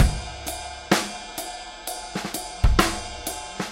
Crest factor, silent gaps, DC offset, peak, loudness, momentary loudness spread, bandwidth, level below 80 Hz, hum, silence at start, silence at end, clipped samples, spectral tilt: 22 dB; none; under 0.1%; -2 dBFS; -27 LUFS; 11 LU; 17 kHz; -28 dBFS; none; 0 s; 0 s; under 0.1%; -4 dB/octave